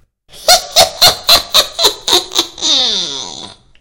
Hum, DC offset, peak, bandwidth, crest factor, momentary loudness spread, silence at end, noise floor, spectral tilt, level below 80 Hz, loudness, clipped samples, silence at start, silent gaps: none; under 0.1%; 0 dBFS; over 20 kHz; 14 dB; 12 LU; 0.3 s; -32 dBFS; 0 dB/octave; -40 dBFS; -9 LUFS; 0.4%; 0.35 s; none